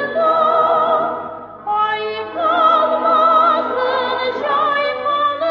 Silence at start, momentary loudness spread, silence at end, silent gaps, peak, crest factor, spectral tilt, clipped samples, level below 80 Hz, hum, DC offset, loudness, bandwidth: 0 s; 9 LU; 0 s; none; -4 dBFS; 12 dB; -5 dB/octave; under 0.1%; -60 dBFS; none; under 0.1%; -16 LUFS; 6.4 kHz